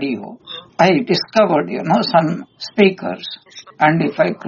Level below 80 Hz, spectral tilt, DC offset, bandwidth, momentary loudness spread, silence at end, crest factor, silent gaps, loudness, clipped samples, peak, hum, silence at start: -60 dBFS; -4 dB/octave; under 0.1%; 7.2 kHz; 15 LU; 0 s; 16 dB; none; -16 LUFS; under 0.1%; 0 dBFS; none; 0 s